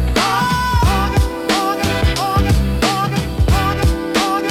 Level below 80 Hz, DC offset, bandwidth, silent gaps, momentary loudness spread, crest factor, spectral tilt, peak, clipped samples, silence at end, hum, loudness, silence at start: -22 dBFS; under 0.1%; 16.5 kHz; none; 3 LU; 12 dB; -5 dB/octave; -4 dBFS; under 0.1%; 0 s; none; -16 LUFS; 0 s